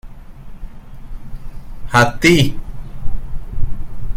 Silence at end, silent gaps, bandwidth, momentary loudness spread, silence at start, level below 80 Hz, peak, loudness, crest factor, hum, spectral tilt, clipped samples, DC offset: 0 s; none; 16 kHz; 27 LU; 0.05 s; -26 dBFS; 0 dBFS; -15 LUFS; 16 dB; none; -5 dB/octave; under 0.1%; under 0.1%